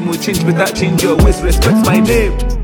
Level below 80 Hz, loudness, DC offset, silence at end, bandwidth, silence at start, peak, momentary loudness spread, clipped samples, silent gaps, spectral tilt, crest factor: -18 dBFS; -12 LUFS; under 0.1%; 0 s; 19 kHz; 0 s; 0 dBFS; 4 LU; under 0.1%; none; -5.5 dB/octave; 12 dB